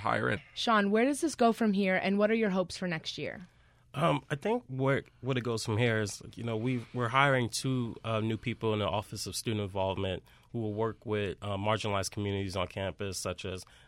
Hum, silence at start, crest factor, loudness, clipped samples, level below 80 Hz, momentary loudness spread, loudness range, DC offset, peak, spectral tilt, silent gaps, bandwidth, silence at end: none; 0 s; 22 dB; -31 LUFS; under 0.1%; -60 dBFS; 10 LU; 5 LU; under 0.1%; -10 dBFS; -5 dB/octave; none; 16 kHz; 0.25 s